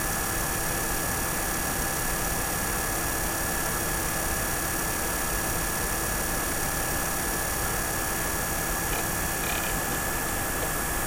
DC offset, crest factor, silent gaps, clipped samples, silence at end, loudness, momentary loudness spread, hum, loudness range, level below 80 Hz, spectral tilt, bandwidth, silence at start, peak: under 0.1%; 14 dB; none; under 0.1%; 0 s; -27 LUFS; 0 LU; none; 0 LU; -36 dBFS; -2.5 dB/octave; 16 kHz; 0 s; -14 dBFS